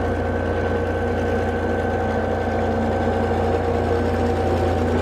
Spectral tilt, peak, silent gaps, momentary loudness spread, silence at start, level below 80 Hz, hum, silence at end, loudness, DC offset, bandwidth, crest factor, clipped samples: -7.5 dB/octave; -8 dBFS; none; 2 LU; 0 s; -34 dBFS; none; 0 s; -22 LUFS; under 0.1%; 10 kHz; 12 dB; under 0.1%